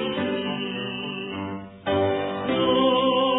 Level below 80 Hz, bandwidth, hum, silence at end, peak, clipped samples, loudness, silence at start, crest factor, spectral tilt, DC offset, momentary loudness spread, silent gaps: -58 dBFS; 4 kHz; none; 0 s; -10 dBFS; under 0.1%; -25 LUFS; 0 s; 14 dB; -9 dB/octave; under 0.1%; 12 LU; none